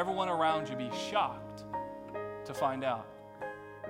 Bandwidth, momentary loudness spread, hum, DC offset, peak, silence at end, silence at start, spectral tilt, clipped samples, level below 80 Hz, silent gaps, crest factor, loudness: 16 kHz; 13 LU; none; under 0.1%; -16 dBFS; 0 s; 0 s; -5 dB/octave; under 0.1%; -68 dBFS; none; 18 dB; -35 LUFS